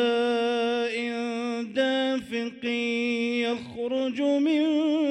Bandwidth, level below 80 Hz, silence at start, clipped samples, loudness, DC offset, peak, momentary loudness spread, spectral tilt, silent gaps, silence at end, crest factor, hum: 11 kHz; -68 dBFS; 0 s; under 0.1%; -26 LUFS; under 0.1%; -12 dBFS; 7 LU; -4.5 dB/octave; none; 0 s; 12 dB; none